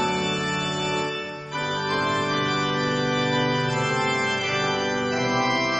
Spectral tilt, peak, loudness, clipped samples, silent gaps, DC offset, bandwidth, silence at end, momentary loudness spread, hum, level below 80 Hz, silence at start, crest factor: -4 dB/octave; -10 dBFS; -24 LUFS; under 0.1%; none; under 0.1%; 8.4 kHz; 0 s; 4 LU; none; -56 dBFS; 0 s; 14 dB